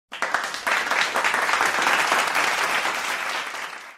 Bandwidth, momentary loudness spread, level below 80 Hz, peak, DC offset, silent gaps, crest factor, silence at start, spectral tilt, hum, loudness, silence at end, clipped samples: 16 kHz; 7 LU; -66 dBFS; -4 dBFS; under 0.1%; none; 20 dB; 0.1 s; 0 dB/octave; none; -22 LUFS; 0 s; under 0.1%